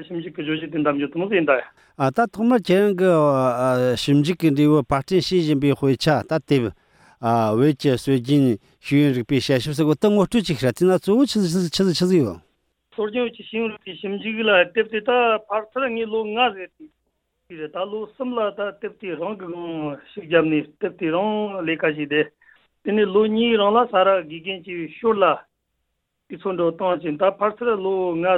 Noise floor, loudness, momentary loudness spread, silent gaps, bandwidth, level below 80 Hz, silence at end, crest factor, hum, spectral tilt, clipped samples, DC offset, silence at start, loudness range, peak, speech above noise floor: -75 dBFS; -21 LUFS; 12 LU; none; 16 kHz; -54 dBFS; 0 s; 18 dB; none; -6.5 dB/octave; under 0.1%; under 0.1%; 0 s; 6 LU; -4 dBFS; 55 dB